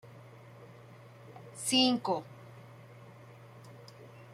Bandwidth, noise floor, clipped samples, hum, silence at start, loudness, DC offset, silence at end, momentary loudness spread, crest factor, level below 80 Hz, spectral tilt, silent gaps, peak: 15.5 kHz; -53 dBFS; under 0.1%; none; 0.05 s; -29 LUFS; under 0.1%; 0 s; 27 LU; 22 dB; -78 dBFS; -3 dB/octave; none; -14 dBFS